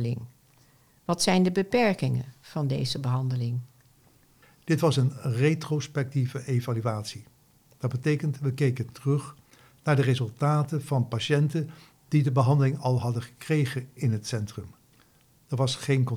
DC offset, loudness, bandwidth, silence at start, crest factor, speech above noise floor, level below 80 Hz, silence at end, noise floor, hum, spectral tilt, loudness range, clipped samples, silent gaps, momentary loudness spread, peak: under 0.1%; -27 LUFS; 14.5 kHz; 0 s; 16 dB; 35 dB; -64 dBFS; 0 s; -61 dBFS; none; -6.5 dB/octave; 4 LU; under 0.1%; none; 12 LU; -10 dBFS